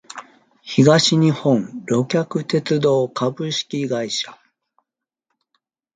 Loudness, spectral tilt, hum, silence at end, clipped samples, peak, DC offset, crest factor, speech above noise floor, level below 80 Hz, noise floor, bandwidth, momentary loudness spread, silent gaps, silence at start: -19 LUFS; -5.5 dB/octave; none; 1.6 s; under 0.1%; 0 dBFS; under 0.1%; 20 dB; 62 dB; -62 dBFS; -81 dBFS; 9.4 kHz; 10 LU; none; 0.15 s